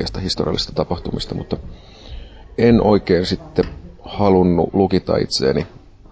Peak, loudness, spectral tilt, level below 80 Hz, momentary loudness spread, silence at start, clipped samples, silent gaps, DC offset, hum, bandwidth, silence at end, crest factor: -2 dBFS; -18 LUFS; -6.5 dB/octave; -34 dBFS; 18 LU; 0 s; under 0.1%; none; under 0.1%; none; 8 kHz; 0.35 s; 16 dB